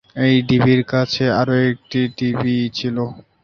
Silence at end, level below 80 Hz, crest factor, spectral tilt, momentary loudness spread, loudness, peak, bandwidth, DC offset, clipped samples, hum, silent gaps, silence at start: 0.25 s; -50 dBFS; 14 dB; -7 dB/octave; 8 LU; -18 LUFS; -2 dBFS; 6.8 kHz; under 0.1%; under 0.1%; none; none; 0.15 s